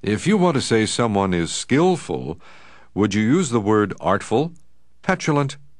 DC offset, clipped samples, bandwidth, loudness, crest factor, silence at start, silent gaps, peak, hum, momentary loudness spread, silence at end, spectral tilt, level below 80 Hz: 0.5%; under 0.1%; 11 kHz; -20 LUFS; 18 dB; 0.05 s; none; -2 dBFS; none; 11 LU; 0.25 s; -5.5 dB/octave; -50 dBFS